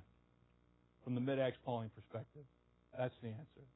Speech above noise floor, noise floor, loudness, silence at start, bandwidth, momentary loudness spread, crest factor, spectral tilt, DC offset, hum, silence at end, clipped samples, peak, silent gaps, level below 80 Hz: 30 dB; -73 dBFS; -43 LUFS; 0 s; 3.9 kHz; 17 LU; 18 dB; -5.5 dB/octave; under 0.1%; 60 Hz at -65 dBFS; 0.1 s; under 0.1%; -26 dBFS; none; -76 dBFS